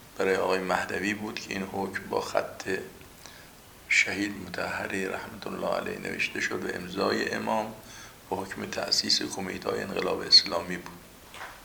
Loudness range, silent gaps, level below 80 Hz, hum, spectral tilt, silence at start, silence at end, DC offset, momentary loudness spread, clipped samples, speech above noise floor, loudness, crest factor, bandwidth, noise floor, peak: 6 LU; none; -60 dBFS; none; -2.5 dB/octave; 0 s; 0 s; under 0.1%; 21 LU; under 0.1%; 21 dB; -28 LUFS; 22 dB; over 20 kHz; -50 dBFS; -8 dBFS